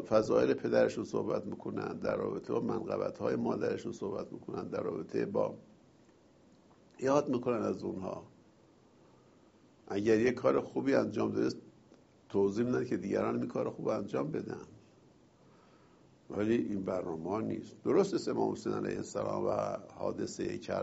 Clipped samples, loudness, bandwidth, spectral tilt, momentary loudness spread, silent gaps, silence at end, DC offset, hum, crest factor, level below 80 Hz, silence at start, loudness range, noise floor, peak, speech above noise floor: under 0.1%; -34 LUFS; 8 kHz; -6.5 dB/octave; 10 LU; none; 0 s; under 0.1%; none; 20 dB; -68 dBFS; 0 s; 5 LU; -63 dBFS; -14 dBFS; 30 dB